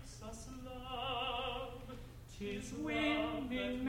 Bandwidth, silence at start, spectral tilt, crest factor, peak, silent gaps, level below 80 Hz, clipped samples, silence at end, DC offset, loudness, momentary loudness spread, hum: 16.5 kHz; 0 s; -4.5 dB/octave; 16 dB; -24 dBFS; none; -54 dBFS; under 0.1%; 0 s; under 0.1%; -40 LUFS; 15 LU; none